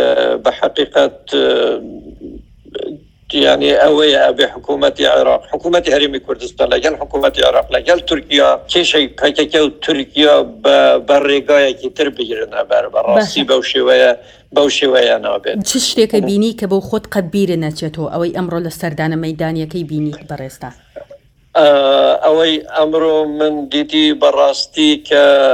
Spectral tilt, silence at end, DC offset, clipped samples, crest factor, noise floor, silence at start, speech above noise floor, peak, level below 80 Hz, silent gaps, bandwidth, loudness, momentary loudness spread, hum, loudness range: -4 dB/octave; 0 s; under 0.1%; under 0.1%; 14 dB; -42 dBFS; 0 s; 29 dB; 0 dBFS; -44 dBFS; none; 16 kHz; -13 LUFS; 11 LU; none; 6 LU